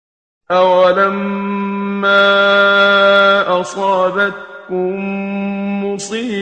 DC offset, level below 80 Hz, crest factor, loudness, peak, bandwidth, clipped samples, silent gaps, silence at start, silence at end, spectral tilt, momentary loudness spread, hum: under 0.1%; -60 dBFS; 14 dB; -13 LUFS; 0 dBFS; 9.4 kHz; under 0.1%; none; 0.5 s; 0 s; -4.5 dB/octave; 11 LU; none